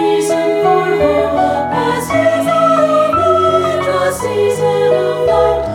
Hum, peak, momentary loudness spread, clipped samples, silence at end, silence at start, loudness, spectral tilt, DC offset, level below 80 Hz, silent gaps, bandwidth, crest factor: none; 0 dBFS; 4 LU; under 0.1%; 0 s; 0 s; -13 LUFS; -5 dB/octave; under 0.1%; -40 dBFS; none; 17 kHz; 12 dB